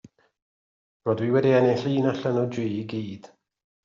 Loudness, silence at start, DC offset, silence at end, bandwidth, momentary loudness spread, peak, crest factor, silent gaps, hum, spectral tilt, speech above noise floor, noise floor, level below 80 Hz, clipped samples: -24 LUFS; 1.05 s; under 0.1%; 0.65 s; 7.4 kHz; 13 LU; -8 dBFS; 18 dB; none; none; -6.5 dB/octave; over 67 dB; under -90 dBFS; -68 dBFS; under 0.1%